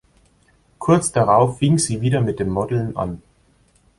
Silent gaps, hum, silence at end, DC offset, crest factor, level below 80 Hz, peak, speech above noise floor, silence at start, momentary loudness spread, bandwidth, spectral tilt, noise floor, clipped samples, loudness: none; none; 0.8 s; under 0.1%; 18 dB; -46 dBFS; -2 dBFS; 40 dB; 0.8 s; 11 LU; 11.5 kHz; -6 dB/octave; -57 dBFS; under 0.1%; -19 LUFS